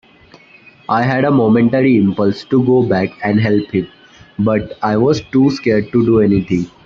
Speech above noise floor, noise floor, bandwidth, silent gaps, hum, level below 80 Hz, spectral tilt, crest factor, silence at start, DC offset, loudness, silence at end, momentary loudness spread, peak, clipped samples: 31 dB; -45 dBFS; 7.2 kHz; none; none; -46 dBFS; -8 dB/octave; 12 dB; 0.9 s; under 0.1%; -14 LUFS; 0.2 s; 8 LU; -2 dBFS; under 0.1%